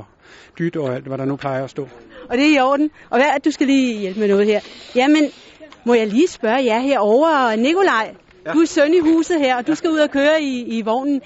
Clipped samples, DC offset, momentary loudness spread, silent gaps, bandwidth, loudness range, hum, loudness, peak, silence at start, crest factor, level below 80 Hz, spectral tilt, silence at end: under 0.1%; under 0.1%; 10 LU; none; 8 kHz; 2 LU; none; -17 LUFS; -4 dBFS; 0 s; 14 dB; -58 dBFS; -3.5 dB/octave; 0.05 s